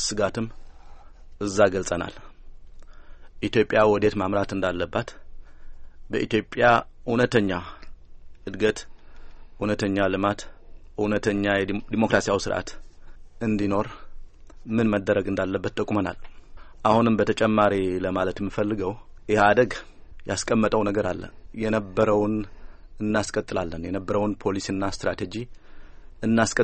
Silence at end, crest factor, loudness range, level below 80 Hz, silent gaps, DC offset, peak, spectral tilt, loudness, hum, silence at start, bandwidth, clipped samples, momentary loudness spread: 0 s; 22 dB; 4 LU; -44 dBFS; none; under 0.1%; -4 dBFS; -5.5 dB/octave; -24 LUFS; none; 0 s; 8.8 kHz; under 0.1%; 13 LU